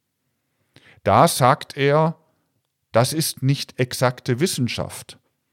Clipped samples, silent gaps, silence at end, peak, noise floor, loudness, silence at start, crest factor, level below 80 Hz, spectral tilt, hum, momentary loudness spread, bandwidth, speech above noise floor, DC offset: under 0.1%; none; 0.4 s; -4 dBFS; -74 dBFS; -20 LUFS; 1.05 s; 18 dB; -60 dBFS; -5 dB/octave; none; 10 LU; 16.5 kHz; 54 dB; under 0.1%